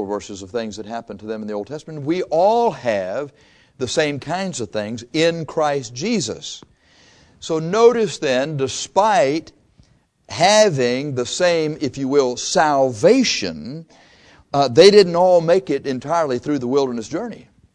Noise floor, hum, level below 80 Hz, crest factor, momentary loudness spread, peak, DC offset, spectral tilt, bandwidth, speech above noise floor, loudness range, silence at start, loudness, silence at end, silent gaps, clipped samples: -55 dBFS; none; -56 dBFS; 18 dB; 15 LU; 0 dBFS; under 0.1%; -4 dB/octave; 11 kHz; 37 dB; 6 LU; 0 s; -18 LUFS; 0.35 s; none; under 0.1%